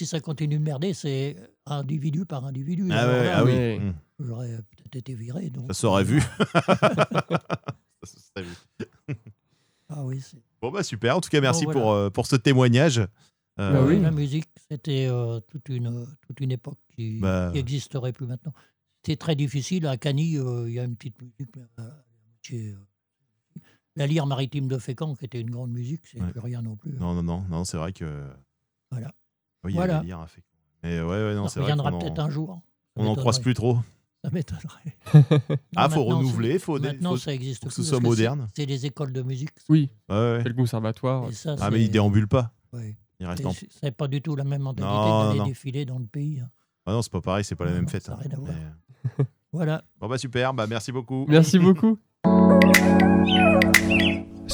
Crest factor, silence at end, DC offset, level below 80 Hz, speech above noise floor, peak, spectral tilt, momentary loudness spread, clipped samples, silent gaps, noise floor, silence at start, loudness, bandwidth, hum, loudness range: 24 dB; 0 s; under 0.1%; -52 dBFS; 53 dB; 0 dBFS; -6 dB/octave; 20 LU; under 0.1%; none; -77 dBFS; 0 s; -24 LUFS; over 20 kHz; none; 10 LU